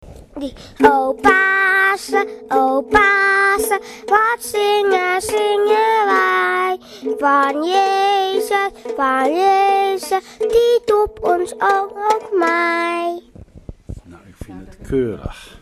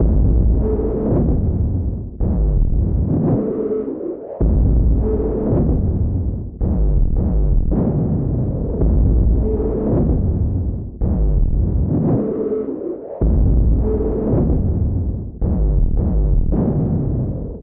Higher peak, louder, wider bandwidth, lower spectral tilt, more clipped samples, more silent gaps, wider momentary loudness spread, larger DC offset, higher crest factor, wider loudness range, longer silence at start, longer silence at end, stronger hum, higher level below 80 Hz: first, 0 dBFS vs -4 dBFS; first, -16 LUFS vs -19 LUFS; first, 15.5 kHz vs 1.9 kHz; second, -3.5 dB/octave vs -15 dB/octave; neither; neither; first, 15 LU vs 7 LU; neither; about the same, 16 dB vs 12 dB; first, 5 LU vs 1 LU; about the same, 0.05 s vs 0 s; about the same, 0.05 s vs 0 s; neither; second, -44 dBFS vs -18 dBFS